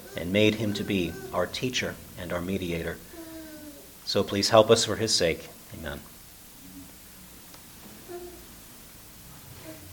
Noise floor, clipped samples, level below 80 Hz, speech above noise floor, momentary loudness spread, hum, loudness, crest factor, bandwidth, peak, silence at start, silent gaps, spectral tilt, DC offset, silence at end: -48 dBFS; under 0.1%; -54 dBFS; 22 dB; 23 LU; none; -26 LUFS; 26 dB; 19 kHz; -4 dBFS; 0 s; none; -4 dB/octave; under 0.1%; 0 s